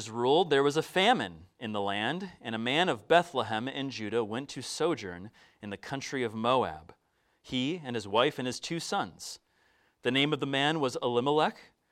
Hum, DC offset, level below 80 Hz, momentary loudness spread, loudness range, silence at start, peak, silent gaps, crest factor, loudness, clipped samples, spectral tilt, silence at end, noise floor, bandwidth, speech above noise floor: none; under 0.1%; -68 dBFS; 13 LU; 5 LU; 0 s; -8 dBFS; none; 22 dB; -30 LUFS; under 0.1%; -4.5 dB/octave; 0.25 s; -69 dBFS; 15 kHz; 39 dB